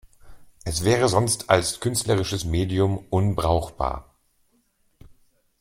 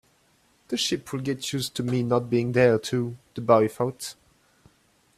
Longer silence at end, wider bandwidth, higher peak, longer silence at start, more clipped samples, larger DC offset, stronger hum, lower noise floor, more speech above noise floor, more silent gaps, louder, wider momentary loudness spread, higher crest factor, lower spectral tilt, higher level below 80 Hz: first, 1.6 s vs 1.05 s; first, 16.5 kHz vs 14.5 kHz; about the same, -2 dBFS vs -4 dBFS; second, 0.25 s vs 0.7 s; neither; neither; neither; about the same, -66 dBFS vs -64 dBFS; first, 44 dB vs 39 dB; neither; about the same, -23 LUFS vs -25 LUFS; second, 9 LU vs 12 LU; about the same, 22 dB vs 22 dB; about the same, -5 dB/octave vs -5 dB/octave; first, -42 dBFS vs -62 dBFS